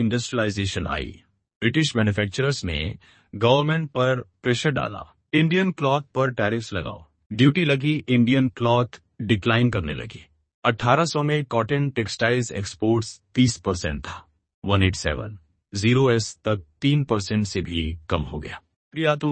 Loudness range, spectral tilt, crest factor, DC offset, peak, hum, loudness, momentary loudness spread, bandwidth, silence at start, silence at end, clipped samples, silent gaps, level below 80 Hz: 3 LU; -5.5 dB/octave; 22 dB; under 0.1%; -2 dBFS; none; -23 LUFS; 14 LU; 8.8 kHz; 0 s; 0 s; under 0.1%; 1.56-1.61 s, 7.26-7.30 s, 10.54-10.62 s, 14.54-14.62 s, 18.76-18.91 s; -44 dBFS